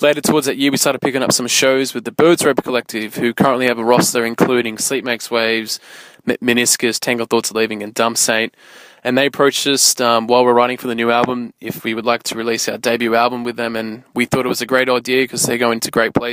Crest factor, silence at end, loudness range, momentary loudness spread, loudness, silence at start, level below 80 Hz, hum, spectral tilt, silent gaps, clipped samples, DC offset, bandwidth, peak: 16 dB; 0 s; 3 LU; 9 LU; -16 LUFS; 0 s; -56 dBFS; none; -3 dB/octave; none; under 0.1%; under 0.1%; 16 kHz; 0 dBFS